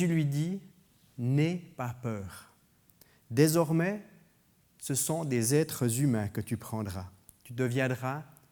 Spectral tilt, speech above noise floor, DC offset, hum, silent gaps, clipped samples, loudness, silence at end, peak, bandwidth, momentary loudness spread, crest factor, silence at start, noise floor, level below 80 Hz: -5.5 dB/octave; 37 dB; under 0.1%; none; none; under 0.1%; -31 LUFS; 0.25 s; -10 dBFS; over 20 kHz; 15 LU; 22 dB; 0 s; -66 dBFS; -68 dBFS